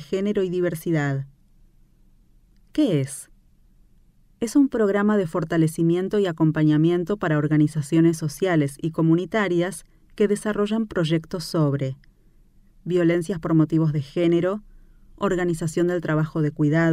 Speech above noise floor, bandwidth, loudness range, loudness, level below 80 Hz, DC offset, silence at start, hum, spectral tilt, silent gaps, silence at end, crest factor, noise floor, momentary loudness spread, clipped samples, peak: 34 dB; 14.5 kHz; 6 LU; -22 LUFS; -52 dBFS; under 0.1%; 0 s; none; -7 dB/octave; none; 0 s; 16 dB; -56 dBFS; 8 LU; under 0.1%; -8 dBFS